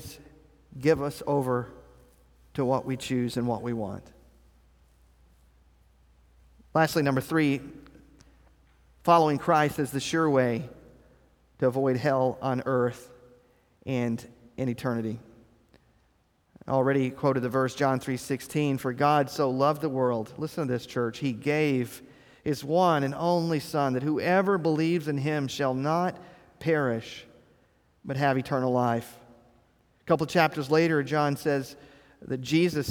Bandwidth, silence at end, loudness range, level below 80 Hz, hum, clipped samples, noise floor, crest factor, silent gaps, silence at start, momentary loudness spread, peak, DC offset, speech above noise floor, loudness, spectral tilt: 19.5 kHz; 0 s; 6 LU; -60 dBFS; none; under 0.1%; -67 dBFS; 22 dB; none; 0 s; 12 LU; -6 dBFS; under 0.1%; 41 dB; -27 LUFS; -6.5 dB/octave